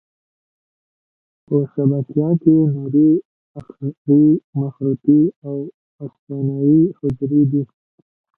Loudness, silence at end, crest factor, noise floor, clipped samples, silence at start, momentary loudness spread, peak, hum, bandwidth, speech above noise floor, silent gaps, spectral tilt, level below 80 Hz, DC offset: -17 LUFS; 0.7 s; 16 dB; under -90 dBFS; under 0.1%; 1.5 s; 15 LU; -2 dBFS; none; 1.5 kHz; over 73 dB; 3.25-3.55 s, 3.97-4.05 s, 4.44-4.53 s, 5.36-5.42 s, 5.74-5.99 s, 6.19-6.27 s; -14.5 dB/octave; -56 dBFS; under 0.1%